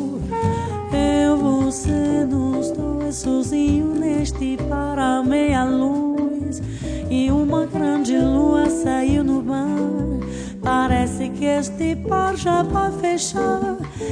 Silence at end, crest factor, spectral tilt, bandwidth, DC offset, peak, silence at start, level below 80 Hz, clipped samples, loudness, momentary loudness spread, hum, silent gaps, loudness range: 0 s; 14 dB; -6 dB/octave; 10 kHz; under 0.1%; -6 dBFS; 0 s; -34 dBFS; under 0.1%; -20 LUFS; 6 LU; none; none; 2 LU